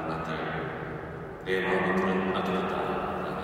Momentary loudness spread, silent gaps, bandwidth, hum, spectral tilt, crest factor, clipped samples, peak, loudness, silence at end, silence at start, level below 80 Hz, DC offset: 11 LU; none; 15 kHz; none; -7 dB/octave; 16 dB; under 0.1%; -14 dBFS; -30 LUFS; 0 s; 0 s; -54 dBFS; under 0.1%